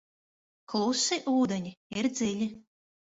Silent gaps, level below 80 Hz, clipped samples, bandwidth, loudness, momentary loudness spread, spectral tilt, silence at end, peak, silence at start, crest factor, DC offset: 1.77-1.90 s; -68 dBFS; under 0.1%; 8 kHz; -30 LUFS; 9 LU; -3.5 dB/octave; 0.5 s; -16 dBFS; 0.7 s; 16 dB; under 0.1%